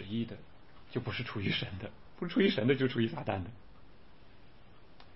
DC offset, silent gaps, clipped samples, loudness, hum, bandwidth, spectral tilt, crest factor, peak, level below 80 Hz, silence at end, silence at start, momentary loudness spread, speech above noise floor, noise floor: 0.3%; none; under 0.1%; -34 LUFS; none; 5.8 kHz; -9.5 dB/octave; 20 dB; -14 dBFS; -62 dBFS; 0.15 s; 0 s; 16 LU; 25 dB; -59 dBFS